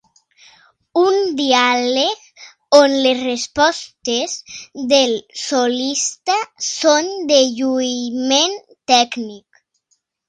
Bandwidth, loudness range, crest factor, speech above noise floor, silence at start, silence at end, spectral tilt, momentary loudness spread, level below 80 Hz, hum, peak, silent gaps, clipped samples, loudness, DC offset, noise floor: 10.5 kHz; 2 LU; 18 dB; 50 dB; 0.95 s; 0.9 s; -1 dB/octave; 11 LU; -62 dBFS; none; 0 dBFS; none; under 0.1%; -16 LUFS; under 0.1%; -66 dBFS